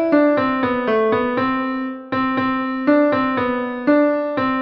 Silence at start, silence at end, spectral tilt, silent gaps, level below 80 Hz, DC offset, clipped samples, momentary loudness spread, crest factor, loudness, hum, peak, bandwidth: 0 s; 0 s; -8.5 dB/octave; none; -54 dBFS; under 0.1%; under 0.1%; 6 LU; 14 dB; -18 LUFS; none; -4 dBFS; 5.6 kHz